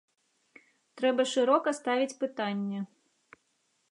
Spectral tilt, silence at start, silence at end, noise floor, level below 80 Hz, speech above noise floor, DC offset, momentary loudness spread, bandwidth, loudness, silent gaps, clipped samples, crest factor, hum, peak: -4.5 dB/octave; 0.95 s; 1.05 s; -75 dBFS; -88 dBFS; 46 dB; under 0.1%; 10 LU; 11 kHz; -29 LUFS; none; under 0.1%; 20 dB; none; -12 dBFS